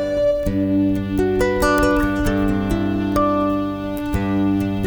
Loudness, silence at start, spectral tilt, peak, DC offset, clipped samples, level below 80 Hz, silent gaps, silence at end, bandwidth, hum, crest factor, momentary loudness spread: -19 LUFS; 0 s; -7 dB/octave; -4 dBFS; under 0.1%; under 0.1%; -30 dBFS; none; 0 s; over 20 kHz; none; 14 dB; 5 LU